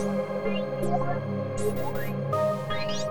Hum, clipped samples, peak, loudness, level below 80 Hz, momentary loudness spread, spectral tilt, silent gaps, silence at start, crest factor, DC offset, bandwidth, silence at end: none; under 0.1%; -14 dBFS; -29 LUFS; -50 dBFS; 4 LU; -6 dB/octave; none; 0 s; 14 dB; 1%; over 20 kHz; 0 s